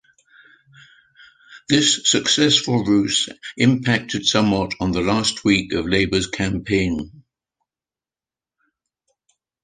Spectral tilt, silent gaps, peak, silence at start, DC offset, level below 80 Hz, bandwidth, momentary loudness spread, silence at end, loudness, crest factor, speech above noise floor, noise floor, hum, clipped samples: -3.5 dB/octave; none; -2 dBFS; 1.5 s; under 0.1%; -44 dBFS; 10 kHz; 7 LU; 2.45 s; -18 LUFS; 20 dB; over 71 dB; under -90 dBFS; none; under 0.1%